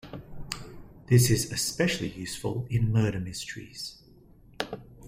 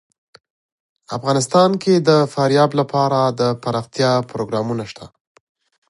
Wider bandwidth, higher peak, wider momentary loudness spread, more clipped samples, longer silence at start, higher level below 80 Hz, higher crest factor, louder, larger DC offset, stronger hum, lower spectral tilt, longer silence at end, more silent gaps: first, 16 kHz vs 11.5 kHz; second, -8 dBFS vs -2 dBFS; first, 16 LU vs 11 LU; neither; second, 0.05 s vs 1.1 s; first, -50 dBFS vs -60 dBFS; about the same, 20 dB vs 16 dB; second, -28 LUFS vs -17 LUFS; neither; neither; about the same, -5 dB/octave vs -5.5 dB/octave; second, 0 s vs 0.85 s; neither